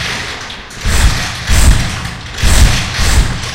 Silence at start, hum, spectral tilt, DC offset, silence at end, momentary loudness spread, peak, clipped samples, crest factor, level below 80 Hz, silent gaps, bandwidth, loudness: 0 s; none; -3.5 dB/octave; under 0.1%; 0 s; 11 LU; 0 dBFS; 0.6%; 12 dB; -14 dBFS; none; 16.5 kHz; -13 LUFS